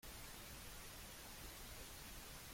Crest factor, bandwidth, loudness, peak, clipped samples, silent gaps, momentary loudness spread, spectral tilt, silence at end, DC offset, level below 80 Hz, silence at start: 14 dB; 16.5 kHz; -54 LUFS; -40 dBFS; under 0.1%; none; 0 LU; -2.5 dB/octave; 0 s; under 0.1%; -62 dBFS; 0 s